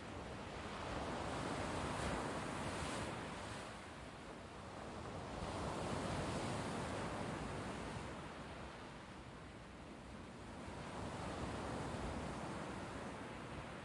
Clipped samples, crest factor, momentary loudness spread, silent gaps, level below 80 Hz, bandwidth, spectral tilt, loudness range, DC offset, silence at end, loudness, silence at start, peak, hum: under 0.1%; 16 dB; 10 LU; none; -58 dBFS; 11.5 kHz; -5 dB/octave; 6 LU; under 0.1%; 0 s; -46 LUFS; 0 s; -30 dBFS; none